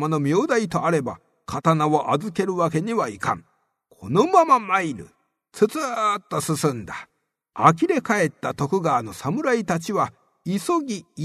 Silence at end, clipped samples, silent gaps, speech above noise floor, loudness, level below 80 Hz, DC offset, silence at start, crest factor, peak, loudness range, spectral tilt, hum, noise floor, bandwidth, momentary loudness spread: 0 s; under 0.1%; none; 39 dB; -22 LUFS; -60 dBFS; under 0.1%; 0 s; 22 dB; 0 dBFS; 2 LU; -6 dB/octave; none; -61 dBFS; 13.5 kHz; 14 LU